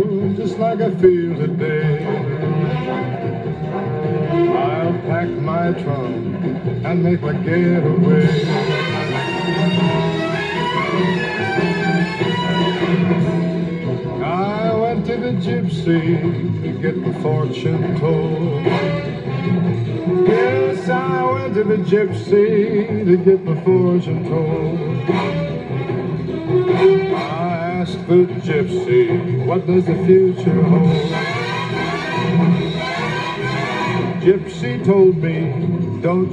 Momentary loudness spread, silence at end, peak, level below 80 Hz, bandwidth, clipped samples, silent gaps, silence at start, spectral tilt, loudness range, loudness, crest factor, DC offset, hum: 8 LU; 0 s; -2 dBFS; -50 dBFS; 8.4 kHz; under 0.1%; none; 0 s; -8 dB/octave; 3 LU; -18 LUFS; 16 dB; under 0.1%; none